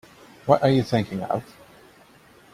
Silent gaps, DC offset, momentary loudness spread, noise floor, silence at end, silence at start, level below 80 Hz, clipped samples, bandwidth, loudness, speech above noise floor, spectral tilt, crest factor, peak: none; under 0.1%; 11 LU; -53 dBFS; 1.1 s; 0.45 s; -58 dBFS; under 0.1%; 15 kHz; -23 LUFS; 31 dB; -7.5 dB/octave; 22 dB; -2 dBFS